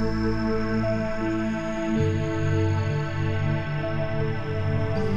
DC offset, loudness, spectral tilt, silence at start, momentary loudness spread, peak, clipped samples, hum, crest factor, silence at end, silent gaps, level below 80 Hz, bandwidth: under 0.1%; -26 LUFS; -7.5 dB/octave; 0 s; 3 LU; -12 dBFS; under 0.1%; none; 12 dB; 0 s; none; -38 dBFS; 7.6 kHz